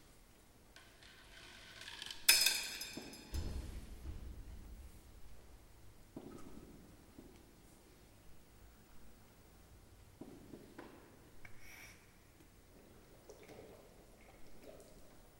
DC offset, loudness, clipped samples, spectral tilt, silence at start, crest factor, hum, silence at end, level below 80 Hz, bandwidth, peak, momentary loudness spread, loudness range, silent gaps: under 0.1%; -36 LUFS; under 0.1%; -1 dB/octave; 0 s; 38 dB; none; 0 s; -58 dBFS; 16.5 kHz; -8 dBFS; 20 LU; 24 LU; none